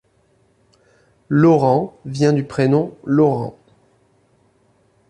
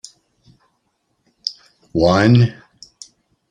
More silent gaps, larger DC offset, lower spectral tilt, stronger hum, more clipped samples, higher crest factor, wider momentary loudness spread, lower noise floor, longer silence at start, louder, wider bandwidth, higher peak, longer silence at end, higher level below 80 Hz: neither; neither; about the same, -8 dB/octave vs -7 dB/octave; neither; neither; about the same, 16 dB vs 18 dB; second, 10 LU vs 22 LU; second, -59 dBFS vs -68 dBFS; second, 1.3 s vs 1.45 s; about the same, -17 LUFS vs -16 LUFS; first, 11 kHz vs 9.8 kHz; about the same, -2 dBFS vs -2 dBFS; first, 1.6 s vs 1 s; second, -56 dBFS vs -48 dBFS